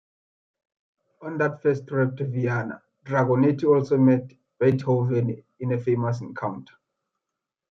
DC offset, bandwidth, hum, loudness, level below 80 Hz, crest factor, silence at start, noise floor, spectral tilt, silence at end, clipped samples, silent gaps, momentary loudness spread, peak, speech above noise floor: under 0.1%; 6.6 kHz; none; -24 LUFS; -66 dBFS; 18 dB; 1.2 s; -86 dBFS; -9.5 dB/octave; 1.1 s; under 0.1%; none; 13 LU; -8 dBFS; 63 dB